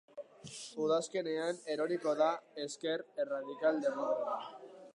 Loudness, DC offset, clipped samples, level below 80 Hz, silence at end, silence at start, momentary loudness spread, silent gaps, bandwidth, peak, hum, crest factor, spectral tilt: -36 LUFS; under 0.1%; under 0.1%; -88 dBFS; 0.05 s; 0.15 s; 15 LU; none; 11 kHz; -18 dBFS; none; 18 dB; -4 dB/octave